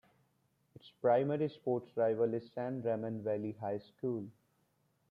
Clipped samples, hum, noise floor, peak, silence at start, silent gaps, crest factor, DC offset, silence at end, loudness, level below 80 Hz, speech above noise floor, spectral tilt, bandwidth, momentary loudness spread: under 0.1%; none; -76 dBFS; -18 dBFS; 0.85 s; none; 18 dB; under 0.1%; 0.8 s; -36 LUFS; -82 dBFS; 41 dB; -9.5 dB/octave; 5.2 kHz; 9 LU